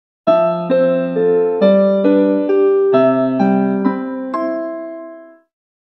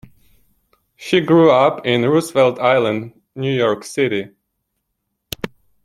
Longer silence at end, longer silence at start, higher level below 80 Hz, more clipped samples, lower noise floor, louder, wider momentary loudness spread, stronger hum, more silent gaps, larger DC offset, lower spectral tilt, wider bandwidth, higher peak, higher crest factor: first, 0.6 s vs 0.35 s; second, 0.25 s vs 1 s; second, -72 dBFS vs -56 dBFS; neither; second, -37 dBFS vs -74 dBFS; about the same, -15 LUFS vs -16 LUFS; second, 11 LU vs 19 LU; neither; neither; neither; first, -10 dB/octave vs -6 dB/octave; second, 5.8 kHz vs 16.5 kHz; about the same, 0 dBFS vs -2 dBFS; about the same, 14 dB vs 16 dB